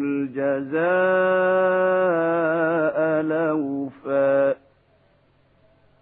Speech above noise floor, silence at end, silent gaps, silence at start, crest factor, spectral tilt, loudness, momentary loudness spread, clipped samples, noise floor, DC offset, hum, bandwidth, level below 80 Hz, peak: 40 dB; 1.45 s; none; 0 s; 14 dB; -10.5 dB/octave; -21 LUFS; 6 LU; under 0.1%; -60 dBFS; under 0.1%; none; 3.9 kHz; -70 dBFS; -8 dBFS